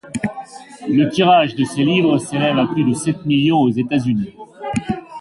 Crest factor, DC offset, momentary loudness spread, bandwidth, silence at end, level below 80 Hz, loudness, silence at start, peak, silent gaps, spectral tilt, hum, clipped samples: 14 dB; under 0.1%; 13 LU; 11.5 kHz; 0 s; -50 dBFS; -17 LUFS; 0.05 s; -2 dBFS; none; -6 dB/octave; none; under 0.1%